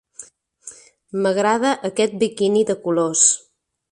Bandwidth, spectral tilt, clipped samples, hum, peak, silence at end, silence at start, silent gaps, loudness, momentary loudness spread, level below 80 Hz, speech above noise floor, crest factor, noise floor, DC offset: 11.5 kHz; -3 dB/octave; under 0.1%; none; -2 dBFS; 0.55 s; 0.2 s; none; -18 LUFS; 17 LU; -66 dBFS; 26 dB; 20 dB; -44 dBFS; under 0.1%